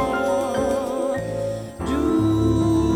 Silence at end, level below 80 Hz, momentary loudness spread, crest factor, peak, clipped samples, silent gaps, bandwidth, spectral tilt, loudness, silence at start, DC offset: 0 s; -36 dBFS; 8 LU; 12 dB; -8 dBFS; under 0.1%; none; 15.5 kHz; -7 dB/octave; -22 LUFS; 0 s; under 0.1%